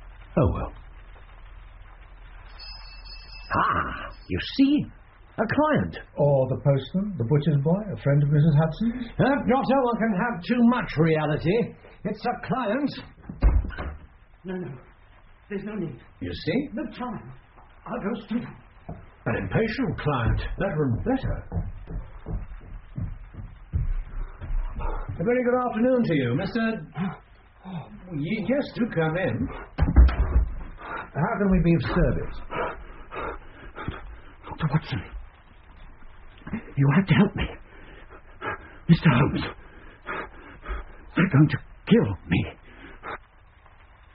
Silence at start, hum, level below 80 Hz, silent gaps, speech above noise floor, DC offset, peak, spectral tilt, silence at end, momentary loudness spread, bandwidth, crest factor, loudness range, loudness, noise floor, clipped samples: 0 s; none; -34 dBFS; none; 29 dB; under 0.1%; -4 dBFS; -6.5 dB/octave; 0.95 s; 20 LU; 5.6 kHz; 22 dB; 10 LU; -25 LUFS; -53 dBFS; under 0.1%